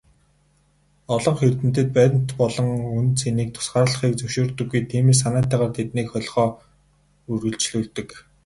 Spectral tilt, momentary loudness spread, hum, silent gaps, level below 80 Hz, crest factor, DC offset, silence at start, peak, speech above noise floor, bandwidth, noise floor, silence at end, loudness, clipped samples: -5.5 dB/octave; 9 LU; none; none; -50 dBFS; 18 dB; under 0.1%; 1.1 s; -4 dBFS; 41 dB; 11.5 kHz; -61 dBFS; 0.25 s; -21 LUFS; under 0.1%